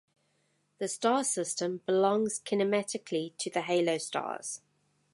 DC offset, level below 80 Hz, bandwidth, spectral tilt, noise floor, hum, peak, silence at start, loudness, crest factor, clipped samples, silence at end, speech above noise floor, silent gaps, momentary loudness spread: under 0.1%; -84 dBFS; 11.5 kHz; -3.5 dB/octave; -74 dBFS; none; -14 dBFS; 0.8 s; -31 LUFS; 18 dB; under 0.1%; 0.55 s; 43 dB; none; 9 LU